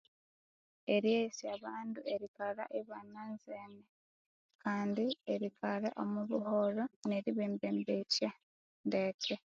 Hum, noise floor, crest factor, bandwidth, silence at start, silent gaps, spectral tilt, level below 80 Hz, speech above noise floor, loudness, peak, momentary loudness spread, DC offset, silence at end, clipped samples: none; under -90 dBFS; 20 dB; 7.4 kHz; 0.85 s; 2.28-2.34 s, 3.89-4.49 s, 4.55-4.59 s, 6.96-7.02 s, 8.43-8.84 s, 9.14-9.19 s; -4 dB/octave; -84 dBFS; over 53 dB; -38 LUFS; -20 dBFS; 13 LU; under 0.1%; 0.15 s; under 0.1%